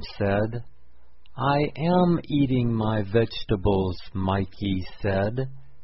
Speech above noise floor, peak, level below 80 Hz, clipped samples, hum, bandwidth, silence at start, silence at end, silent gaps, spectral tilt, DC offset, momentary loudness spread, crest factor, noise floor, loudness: 32 dB; -8 dBFS; -42 dBFS; under 0.1%; none; 5.8 kHz; 0 s; 0.25 s; none; -11 dB/octave; 1%; 8 LU; 16 dB; -56 dBFS; -25 LUFS